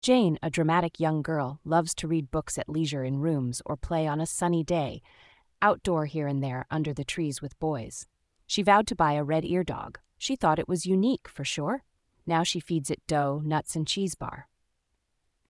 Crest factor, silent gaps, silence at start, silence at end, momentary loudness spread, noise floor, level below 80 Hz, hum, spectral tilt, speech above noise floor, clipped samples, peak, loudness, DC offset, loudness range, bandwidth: 20 dB; none; 0.05 s; 1.05 s; 10 LU; -76 dBFS; -52 dBFS; none; -5 dB/octave; 49 dB; under 0.1%; -8 dBFS; -28 LUFS; under 0.1%; 3 LU; 12 kHz